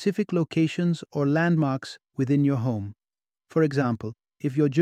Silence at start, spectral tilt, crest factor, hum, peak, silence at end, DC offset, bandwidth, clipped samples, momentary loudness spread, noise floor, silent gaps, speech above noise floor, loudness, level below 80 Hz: 0 s; -8 dB/octave; 16 dB; none; -8 dBFS; 0 s; under 0.1%; 9.8 kHz; under 0.1%; 10 LU; under -90 dBFS; none; over 66 dB; -25 LUFS; -66 dBFS